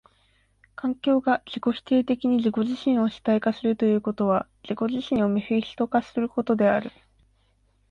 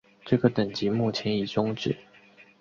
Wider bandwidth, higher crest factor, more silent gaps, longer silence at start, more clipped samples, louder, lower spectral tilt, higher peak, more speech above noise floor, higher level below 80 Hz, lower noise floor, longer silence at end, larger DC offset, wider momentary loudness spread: about the same, 7 kHz vs 7.4 kHz; second, 16 dB vs 22 dB; neither; first, 0.85 s vs 0.25 s; neither; first, -24 LUFS vs -27 LUFS; about the same, -7.5 dB/octave vs -7 dB/octave; about the same, -8 dBFS vs -6 dBFS; first, 41 dB vs 29 dB; about the same, -60 dBFS vs -58 dBFS; first, -65 dBFS vs -55 dBFS; first, 1 s vs 0.2 s; neither; about the same, 6 LU vs 7 LU